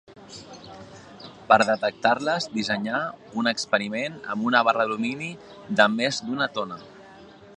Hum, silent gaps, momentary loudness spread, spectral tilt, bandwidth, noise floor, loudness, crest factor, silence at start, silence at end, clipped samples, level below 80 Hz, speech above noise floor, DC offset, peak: none; none; 23 LU; -4 dB/octave; 10.5 kHz; -47 dBFS; -24 LUFS; 24 dB; 0.1 s; 0.05 s; under 0.1%; -66 dBFS; 23 dB; under 0.1%; -2 dBFS